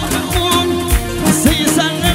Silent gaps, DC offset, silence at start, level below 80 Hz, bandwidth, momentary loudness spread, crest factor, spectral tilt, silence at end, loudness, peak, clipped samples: none; under 0.1%; 0 s; -22 dBFS; 17 kHz; 4 LU; 14 dB; -4 dB/octave; 0 s; -14 LUFS; 0 dBFS; under 0.1%